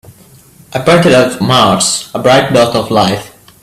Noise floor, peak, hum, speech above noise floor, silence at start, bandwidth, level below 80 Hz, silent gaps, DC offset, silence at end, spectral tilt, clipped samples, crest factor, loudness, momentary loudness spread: -40 dBFS; 0 dBFS; none; 31 dB; 0.7 s; 15.5 kHz; -44 dBFS; none; under 0.1%; 0.35 s; -4 dB/octave; under 0.1%; 10 dB; -9 LUFS; 7 LU